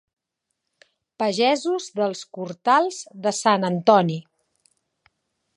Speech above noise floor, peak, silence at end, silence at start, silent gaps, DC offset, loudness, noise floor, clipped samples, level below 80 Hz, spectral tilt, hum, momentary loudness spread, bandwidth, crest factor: 59 dB; -2 dBFS; 1.35 s; 1.2 s; none; under 0.1%; -21 LUFS; -80 dBFS; under 0.1%; -76 dBFS; -4.5 dB/octave; none; 10 LU; 11 kHz; 22 dB